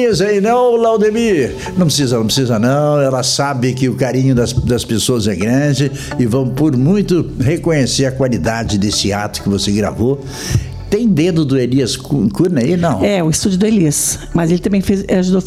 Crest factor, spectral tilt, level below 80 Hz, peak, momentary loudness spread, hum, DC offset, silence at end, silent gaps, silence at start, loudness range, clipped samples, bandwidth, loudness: 12 dB; -5.5 dB/octave; -34 dBFS; -2 dBFS; 5 LU; none; under 0.1%; 0 s; none; 0 s; 2 LU; under 0.1%; 15.5 kHz; -14 LUFS